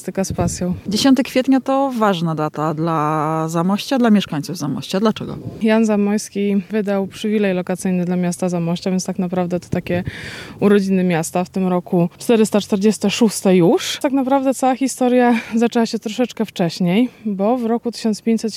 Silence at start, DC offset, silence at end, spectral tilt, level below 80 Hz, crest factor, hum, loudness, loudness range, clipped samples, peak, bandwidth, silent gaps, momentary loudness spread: 0 s; under 0.1%; 0 s; -5.5 dB/octave; -48 dBFS; 16 dB; none; -18 LUFS; 4 LU; under 0.1%; -2 dBFS; 15.5 kHz; none; 7 LU